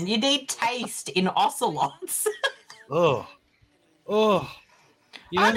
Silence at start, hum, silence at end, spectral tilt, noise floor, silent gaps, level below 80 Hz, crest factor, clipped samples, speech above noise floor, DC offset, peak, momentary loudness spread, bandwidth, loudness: 0 s; none; 0 s; -3.5 dB/octave; -63 dBFS; none; -66 dBFS; 18 dB; under 0.1%; 39 dB; under 0.1%; -8 dBFS; 8 LU; 16.5 kHz; -25 LUFS